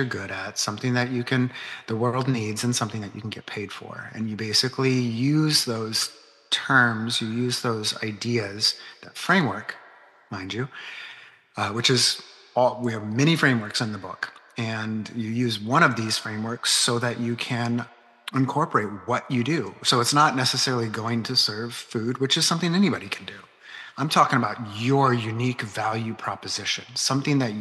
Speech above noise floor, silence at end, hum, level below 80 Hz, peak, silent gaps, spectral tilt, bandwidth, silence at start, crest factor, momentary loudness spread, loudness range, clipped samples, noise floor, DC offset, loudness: 27 dB; 0 s; none; -74 dBFS; -4 dBFS; none; -4 dB/octave; 12.5 kHz; 0 s; 20 dB; 14 LU; 4 LU; under 0.1%; -51 dBFS; under 0.1%; -24 LUFS